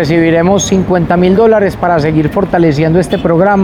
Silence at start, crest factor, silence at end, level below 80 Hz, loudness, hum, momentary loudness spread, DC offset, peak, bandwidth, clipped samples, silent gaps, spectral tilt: 0 s; 8 dB; 0 s; -32 dBFS; -10 LUFS; none; 4 LU; 0.1%; 0 dBFS; 14.5 kHz; under 0.1%; none; -6 dB/octave